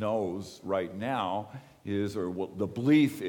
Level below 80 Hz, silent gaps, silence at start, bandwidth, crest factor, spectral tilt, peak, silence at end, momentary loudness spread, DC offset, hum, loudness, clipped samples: -68 dBFS; none; 0 s; 18 kHz; 18 dB; -7 dB/octave; -12 dBFS; 0 s; 13 LU; under 0.1%; none; -31 LUFS; under 0.1%